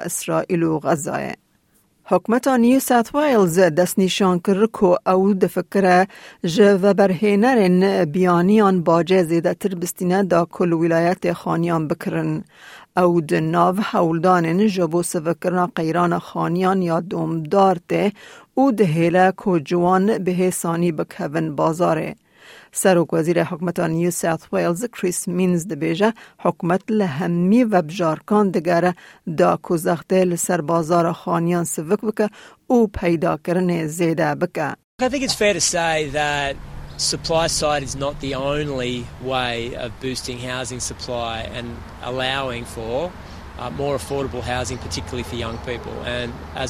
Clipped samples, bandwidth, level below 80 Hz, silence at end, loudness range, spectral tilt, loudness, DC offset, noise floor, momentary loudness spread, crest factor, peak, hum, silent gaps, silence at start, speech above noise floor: under 0.1%; 16.5 kHz; -46 dBFS; 0 s; 9 LU; -5.5 dB/octave; -20 LUFS; under 0.1%; -60 dBFS; 11 LU; 16 dB; -2 dBFS; none; 34.84-34.98 s; 0 s; 41 dB